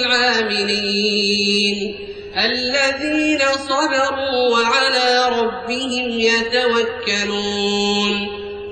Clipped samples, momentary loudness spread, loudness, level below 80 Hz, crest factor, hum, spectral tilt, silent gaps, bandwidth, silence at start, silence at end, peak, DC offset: under 0.1%; 6 LU; -17 LUFS; -50 dBFS; 14 dB; none; -3 dB/octave; none; 9.2 kHz; 0 s; 0 s; -4 dBFS; under 0.1%